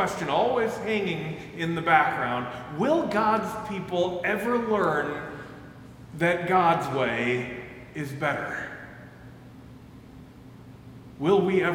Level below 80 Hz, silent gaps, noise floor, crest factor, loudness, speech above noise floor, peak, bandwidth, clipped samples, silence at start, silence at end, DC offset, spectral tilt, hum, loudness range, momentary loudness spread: -58 dBFS; none; -46 dBFS; 22 dB; -26 LUFS; 21 dB; -6 dBFS; 17 kHz; under 0.1%; 0 s; 0 s; under 0.1%; -6 dB/octave; none; 10 LU; 24 LU